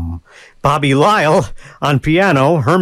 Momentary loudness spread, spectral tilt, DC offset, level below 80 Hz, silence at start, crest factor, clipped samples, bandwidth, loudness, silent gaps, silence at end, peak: 14 LU; -6 dB/octave; under 0.1%; -36 dBFS; 0 s; 12 dB; under 0.1%; 15 kHz; -13 LUFS; none; 0 s; 0 dBFS